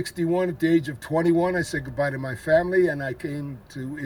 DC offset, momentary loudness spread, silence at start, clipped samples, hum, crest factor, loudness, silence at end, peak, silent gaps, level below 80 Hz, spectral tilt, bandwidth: under 0.1%; 12 LU; 0 s; under 0.1%; none; 16 dB; -24 LUFS; 0 s; -8 dBFS; none; -52 dBFS; -6.5 dB/octave; 17 kHz